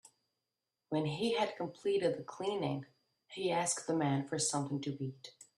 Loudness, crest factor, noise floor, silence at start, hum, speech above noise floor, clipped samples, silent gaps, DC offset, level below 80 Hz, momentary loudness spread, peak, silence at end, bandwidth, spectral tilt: -36 LUFS; 16 dB; -89 dBFS; 0.9 s; none; 54 dB; under 0.1%; none; under 0.1%; -78 dBFS; 9 LU; -20 dBFS; 0.15 s; 12.5 kHz; -4.5 dB/octave